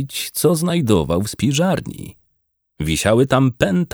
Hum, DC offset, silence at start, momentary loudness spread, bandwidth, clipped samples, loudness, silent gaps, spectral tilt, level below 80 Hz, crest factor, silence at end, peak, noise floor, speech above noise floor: none; under 0.1%; 0 s; 11 LU; over 20 kHz; under 0.1%; -18 LUFS; none; -5.5 dB/octave; -40 dBFS; 16 dB; 0.05 s; -2 dBFS; -69 dBFS; 51 dB